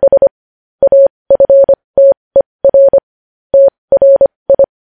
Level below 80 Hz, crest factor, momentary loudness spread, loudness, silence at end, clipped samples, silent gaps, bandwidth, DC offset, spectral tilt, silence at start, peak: -44 dBFS; 8 dB; 6 LU; -9 LUFS; 0.15 s; under 0.1%; 0.31-0.79 s, 1.10-1.25 s, 1.84-1.94 s, 2.17-2.31 s, 2.46-2.59 s, 3.03-3.50 s, 3.78-3.88 s, 4.36-4.46 s; 1.7 kHz; 0.2%; -11 dB/octave; 0 s; 0 dBFS